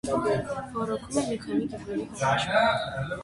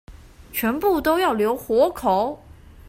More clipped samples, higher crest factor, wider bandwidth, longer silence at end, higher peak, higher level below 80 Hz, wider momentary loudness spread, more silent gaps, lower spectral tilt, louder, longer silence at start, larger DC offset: neither; about the same, 18 dB vs 16 dB; second, 11.5 kHz vs 16 kHz; about the same, 0 s vs 0.1 s; about the same, -8 dBFS vs -6 dBFS; second, -52 dBFS vs -46 dBFS; about the same, 9 LU vs 8 LU; neither; about the same, -5 dB/octave vs -5 dB/octave; second, -28 LUFS vs -21 LUFS; about the same, 0.05 s vs 0.1 s; neither